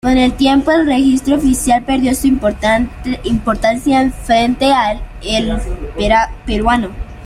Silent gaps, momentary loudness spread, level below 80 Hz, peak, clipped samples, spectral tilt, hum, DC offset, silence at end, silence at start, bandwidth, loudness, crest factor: none; 8 LU; -26 dBFS; 0 dBFS; under 0.1%; -4.5 dB/octave; none; under 0.1%; 0 s; 0.05 s; 15 kHz; -14 LUFS; 12 dB